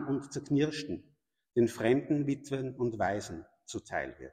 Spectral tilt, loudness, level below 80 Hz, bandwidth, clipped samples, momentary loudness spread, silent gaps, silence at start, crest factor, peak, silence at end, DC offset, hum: -6 dB/octave; -32 LUFS; -64 dBFS; 15 kHz; under 0.1%; 14 LU; none; 0 s; 18 dB; -14 dBFS; 0.05 s; under 0.1%; none